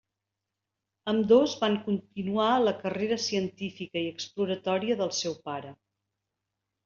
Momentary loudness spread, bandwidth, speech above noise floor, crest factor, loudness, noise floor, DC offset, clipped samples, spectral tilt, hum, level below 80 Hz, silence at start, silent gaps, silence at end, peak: 14 LU; 7.4 kHz; 59 dB; 20 dB; -28 LUFS; -86 dBFS; under 0.1%; under 0.1%; -4 dB/octave; none; -70 dBFS; 1.05 s; none; 1.1 s; -10 dBFS